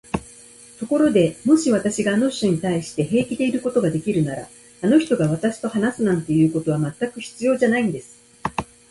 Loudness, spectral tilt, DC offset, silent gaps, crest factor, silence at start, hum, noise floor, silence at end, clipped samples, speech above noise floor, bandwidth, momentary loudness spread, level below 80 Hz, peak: -21 LUFS; -6 dB/octave; under 0.1%; none; 16 dB; 0.15 s; none; -45 dBFS; 0.3 s; under 0.1%; 26 dB; 11.5 kHz; 11 LU; -52 dBFS; -4 dBFS